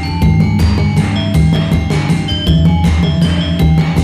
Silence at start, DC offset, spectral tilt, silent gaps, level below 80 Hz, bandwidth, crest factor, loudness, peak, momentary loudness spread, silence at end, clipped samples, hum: 0 s; under 0.1%; -7 dB/octave; none; -20 dBFS; 13 kHz; 10 dB; -12 LUFS; -2 dBFS; 3 LU; 0 s; under 0.1%; none